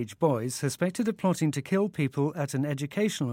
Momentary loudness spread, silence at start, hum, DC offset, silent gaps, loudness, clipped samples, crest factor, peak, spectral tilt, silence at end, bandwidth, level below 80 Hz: 3 LU; 0 s; none; under 0.1%; none; -28 LUFS; under 0.1%; 18 dB; -10 dBFS; -6 dB/octave; 0 s; 17 kHz; -70 dBFS